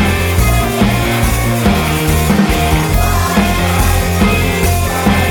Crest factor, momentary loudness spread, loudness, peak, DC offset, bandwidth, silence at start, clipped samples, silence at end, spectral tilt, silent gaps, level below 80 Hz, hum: 12 dB; 1 LU; -13 LUFS; 0 dBFS; under 0.1%; 20 kHz; 0 s; under 0.1%; 0 s; -5 dB/octave; none; -18 dBFS; none